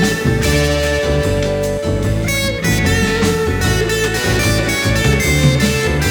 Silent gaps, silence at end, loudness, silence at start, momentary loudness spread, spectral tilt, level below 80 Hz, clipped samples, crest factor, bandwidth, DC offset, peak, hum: none; 0 s; -15 LUFS; 0 s; 4 LU; -4.5 dB/octave; -24 dBFS; under 0.1%; 14 dB; over 20 kHz; under 0.1%; 0 dBFS; none